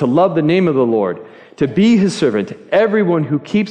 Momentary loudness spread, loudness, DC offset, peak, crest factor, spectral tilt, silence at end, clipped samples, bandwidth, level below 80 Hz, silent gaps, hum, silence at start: 8 LU; -15 LUFS; under 0.1%; -2 dBFS; 12 dB; -7 dB/octave; 0 s; under 0.1%; 10 kHz; -56 dBFS; none; none; 0 s